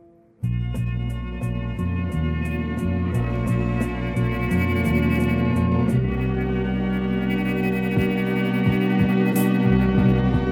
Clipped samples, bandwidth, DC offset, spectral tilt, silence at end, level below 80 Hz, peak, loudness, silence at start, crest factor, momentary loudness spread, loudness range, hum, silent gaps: under 0.1%; 18 kHz; under 0.1%; -8 dB/octave; 0 s; -32 dBFS; -6 dBFS; -22 LUFS; 0.4 s; 16 dB; 8 LU; 5 LU; none; none